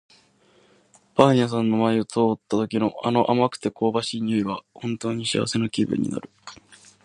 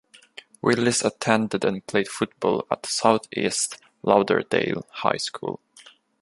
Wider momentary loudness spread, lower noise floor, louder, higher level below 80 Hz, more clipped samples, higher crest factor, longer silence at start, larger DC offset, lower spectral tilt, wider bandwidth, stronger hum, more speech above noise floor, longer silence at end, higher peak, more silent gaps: first, 11 LU vs 8 LU; first, -59 dBFS vs -52 dBFS; about the same, -23 LUFS vs -24 LUFS; about the same, -62 dBFS vs -64 dBFS; neither; about the same, 24 dB vs 22 dB; first, 1.15 s vs 0.35 s; neither; first, -6 dB/octave vs -3.5 dB/octave; about the same, 11 kHz vs 11.5 kHz; neither; first, 36 dB vs 29 dB; first, 0.5 s vs 0.3 s; about the same, 0 dBFS vs -2 dBFS; neither